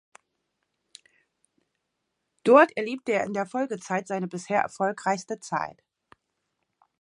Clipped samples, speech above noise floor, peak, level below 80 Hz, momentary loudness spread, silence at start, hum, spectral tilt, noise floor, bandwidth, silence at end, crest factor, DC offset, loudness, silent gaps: under 0.1%; 55 dB; -4 dBFS; -76 dBFS; 13 LU; 2.45 s; none; -5 dB/octave; -80 dBFS; 11.5 kHz; 1.3 s; 24 dB; under 0.1%; -25 LUFS; none